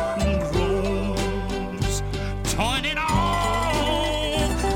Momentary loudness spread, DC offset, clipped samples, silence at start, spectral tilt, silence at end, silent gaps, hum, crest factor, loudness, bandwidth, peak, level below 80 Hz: 5 LU; under 0.1%; under 0.1%; 0 s; -4.5 dB/octave; 0 s; none; none; 16 dB; -24 LUFS; 17 kHz; -8 dBFS; -30 dBFS